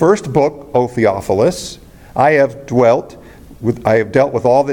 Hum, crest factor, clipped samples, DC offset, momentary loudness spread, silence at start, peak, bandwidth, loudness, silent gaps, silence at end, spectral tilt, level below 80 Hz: none; 14 dB; under 0.1%; under 0.1%; 9 LU; 0 s; 0 dBFS; 17 kHz; -14 LUFS; none; 0 s; -6.5 dB/octave; -44 dBFS